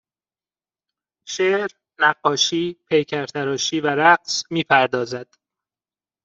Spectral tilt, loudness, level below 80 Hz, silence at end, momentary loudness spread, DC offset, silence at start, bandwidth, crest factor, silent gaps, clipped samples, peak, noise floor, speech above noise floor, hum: -3 dB/octave; -19 LUFS; -68 dBFS; 1 s; 10 LU; under 0.1%; 1.25 s; 7.8 kHz; 20 dB; none; under 0.1%; -2 dBFS; under -90 dBFS; over 70 dB; none